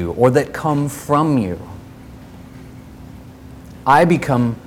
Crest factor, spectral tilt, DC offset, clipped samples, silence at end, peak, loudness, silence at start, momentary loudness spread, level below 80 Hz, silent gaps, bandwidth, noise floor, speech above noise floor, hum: 18 dB; -7 dB/octave; under 0.1%; under 0.1%; 0.1 s; 0 dBFS; -16 LUFS; 0 s; 25 LU; -44 dBFS; none; 18 kHz; -38 dBFS; 22 dB; none